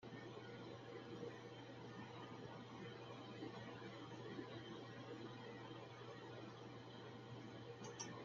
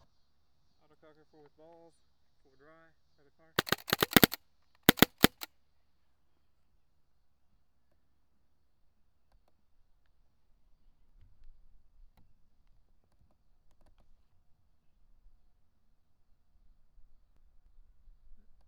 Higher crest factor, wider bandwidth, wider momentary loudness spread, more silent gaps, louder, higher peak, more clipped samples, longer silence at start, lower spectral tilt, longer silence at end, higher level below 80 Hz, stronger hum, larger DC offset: second, 20 dB vs 38 dB; second, 7.4 kHz vs over 20 kHz; second, 3 LU vs 20 LU; neither; second, -55 LUFS vs -27 LUFS; second, -34 dBFS vs -2 dBFS; neither; second, 0 s vs 3.6 s; about the same, -4.5 dB/octave vs -3.5 dB/octave; second, 0 s vs 13.4 s; second, -84 dBFS vs -60 dBFS; neither; neither